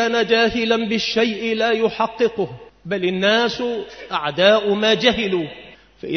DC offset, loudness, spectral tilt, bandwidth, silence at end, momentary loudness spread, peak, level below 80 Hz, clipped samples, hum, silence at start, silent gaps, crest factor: under 0.1%; -19 LUFS; -4.5 dB/octave; 6.6 kHz; 0 s; 12 LU; 0 dBFS; -50 dBFS; under 0.1%; none; 0 s; none; 18 dB